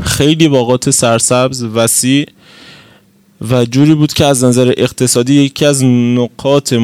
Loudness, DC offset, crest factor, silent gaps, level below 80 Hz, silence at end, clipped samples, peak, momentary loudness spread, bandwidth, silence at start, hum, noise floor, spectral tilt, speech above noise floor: -10 LUFS; under 0.1%; 10 dB; none; -42 dBFS; 0 s; 0.9%; 0 dBFS; 5 LU; 16.5 kHz; 0 s; none; -46 dBFS; -4.5 dB/octave; 36 dB